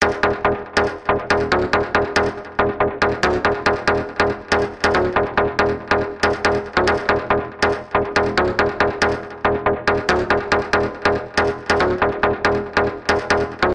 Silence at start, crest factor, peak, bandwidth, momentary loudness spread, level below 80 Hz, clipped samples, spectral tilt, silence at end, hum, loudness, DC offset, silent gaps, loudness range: 0 s; 14 dB; -4 dBFS; 10.5 kHz; 3 LU; -38 dBFS; under 0.1%; -5 dB/octave; 0 s; none; -19 LUFS; under 0.1%; none; 0 LU